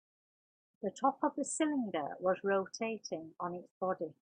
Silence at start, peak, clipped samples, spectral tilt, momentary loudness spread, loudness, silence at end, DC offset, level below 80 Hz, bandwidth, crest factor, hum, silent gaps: 0.8 s; -16 dBFS; under 0.1%; -4.5 dB/octave; 9 LU; -36 LUFS; 0.3 s; under 0.1%; -82 dBFS; 10 kHz; 20 dB; none; 3.71-3.81 s